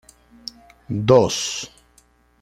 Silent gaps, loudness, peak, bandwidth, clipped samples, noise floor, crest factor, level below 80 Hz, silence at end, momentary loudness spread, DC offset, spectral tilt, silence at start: none; -19 LUFS; -2 dBFS; 14 kHz; under 0.1%; -57 dBFS; 20 dB; -52 dBFS; 0.75 s; 22 LU; under 0.1%; -4.5 dB/octave; 0.9 s